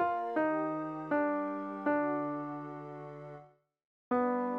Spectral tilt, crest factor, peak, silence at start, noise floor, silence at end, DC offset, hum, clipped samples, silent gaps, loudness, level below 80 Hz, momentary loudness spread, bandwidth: -9 dB/octave; 16 dB; -20 dBFS; 0 s; -59 dBFS; 0 s; under 0.1%; none; under 0.1%; 3.85-4.11 s; -34 LUFS; -80 dBFS; 14 LU; 4.7 kHz